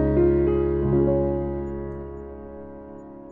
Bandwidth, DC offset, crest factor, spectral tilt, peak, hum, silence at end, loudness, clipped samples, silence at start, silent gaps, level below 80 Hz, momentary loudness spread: 3.1 kHz; under 0.1%; 14 dB; -12.5 dB/octave; -8 dBFS; none; 0 s; -23 LUFS; under 0.1%; 0 s; none; -34 dBFS; 20 LU